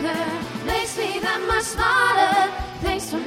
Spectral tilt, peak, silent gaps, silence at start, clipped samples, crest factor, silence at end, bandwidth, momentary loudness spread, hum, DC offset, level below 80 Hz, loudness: -3 dB/octave; -4 dBFS; none; 0 s; under 0.1%; 18 dB; 0 s; 17 kHz; 9 LU; none; under 0.1%; -38 dBFS; -21 LUFS